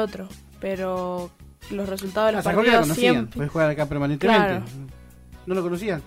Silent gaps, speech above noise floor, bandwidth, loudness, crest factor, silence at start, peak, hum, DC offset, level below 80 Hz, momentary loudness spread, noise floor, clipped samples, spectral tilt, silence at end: none; 23 dB; 16 kHz; -22 LUFS; 16 dB; 0 s; -6 dBFS; none; under 0.1%; -48 dBFS; 20 LU; -45 dBFS; under 0.1%; -5.5 dB/octave; 0 s